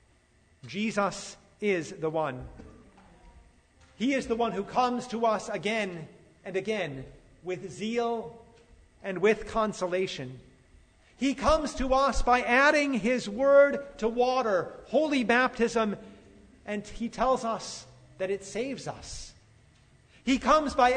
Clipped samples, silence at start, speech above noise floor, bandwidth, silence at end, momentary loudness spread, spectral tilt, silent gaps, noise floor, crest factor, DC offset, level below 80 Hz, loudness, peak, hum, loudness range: under 0.1%; 0.65 s; 36 dB; 9.6 kHz; 0 s; 18 LU; -4.5 dB/octave; none; -63 dBFS; 20 dB; under 0.1%; -46 dBFS; -28 LUFS; -8 dBFS; none; 9 LU